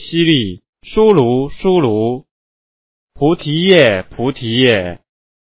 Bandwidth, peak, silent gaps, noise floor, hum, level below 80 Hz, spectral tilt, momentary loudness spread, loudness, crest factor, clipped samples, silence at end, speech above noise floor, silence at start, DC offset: 4 kHz; 0 dBFS; 0.69-0.73 s, 2.31-3.08 s; under -90 dBFS; none; -42 dBFS; -10 dB/octave; 11 LU; -13 LUFS; 14 dB; 0.1%; 0.45 s; over 77 dB; 0 s; under 0.1%